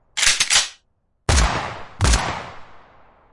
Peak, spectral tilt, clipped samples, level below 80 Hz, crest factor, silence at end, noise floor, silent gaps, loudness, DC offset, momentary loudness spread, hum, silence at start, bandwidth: -2 dBFS; -2 dB/octave; under 0.1%; -26 dBFS; 20 dB; 0.55 s; -65 dBFS; none; -19 LUFS; under 0.1%; 16 LU; none; 0.15 s; 11.5 kHz